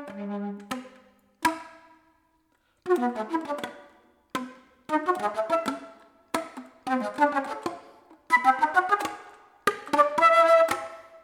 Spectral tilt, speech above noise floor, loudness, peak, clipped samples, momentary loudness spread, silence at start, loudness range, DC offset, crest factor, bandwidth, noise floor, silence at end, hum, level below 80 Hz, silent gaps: -4 dB/octave; 42 dB; -25 LUFS; -8 dBFS; under 0.1%; 19 LU; 0 s; 9 LU; under 0.1%; 20 dB; 18 kHz; -69 dBFS; 0.05 s; none; -72 dBFS; none